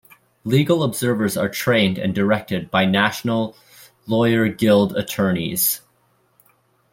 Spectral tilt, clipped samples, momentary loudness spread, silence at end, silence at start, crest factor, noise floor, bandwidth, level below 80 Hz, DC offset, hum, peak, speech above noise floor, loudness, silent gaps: -5 dB/octave; under 0.1%; 6 LU; 1.15 s; 0.45 s; 18 dB; -62 dBFS; 16.5 kHz; -56 dBFS; under 0.1%; none; -2 dBFS; 43 dB; -19 LUFS; none